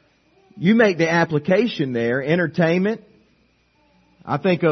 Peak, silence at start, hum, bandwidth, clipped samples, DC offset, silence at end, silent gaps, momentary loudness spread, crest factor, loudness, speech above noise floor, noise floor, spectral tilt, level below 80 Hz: -2 dBFS; 0.55 s; none; 6.4 kHz; under 0.1%; under 0.1%; 0 s; none; 7 LU; 18 dB; -19 LUFS; 42 dB; -61 dBFS; -7 dB/octave; -62 dBFS